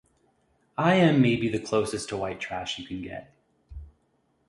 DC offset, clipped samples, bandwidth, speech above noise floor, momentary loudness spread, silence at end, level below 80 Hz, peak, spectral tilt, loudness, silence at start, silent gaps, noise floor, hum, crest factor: under 0.1%; under 0.1%; 11.5 kHz; 45 dB; 22 LU; 0.6 s; -52 dBFS; -8 dBFS; -6 dB/octave; -26 LUFS; 0.8 s; none; -70 dBFS; none; 20 dB